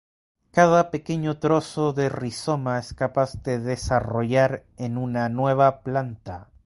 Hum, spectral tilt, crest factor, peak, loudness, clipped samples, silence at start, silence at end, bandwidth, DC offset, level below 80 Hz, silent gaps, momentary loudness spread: none; -6.5 dB/octave; 20 dB; -2 dBFS; -23 LUFS; under 0.1%; 0.55 s; 0.25 s; 11.5 kHz; under 0.1%; -48 dBFS; none; 9 LU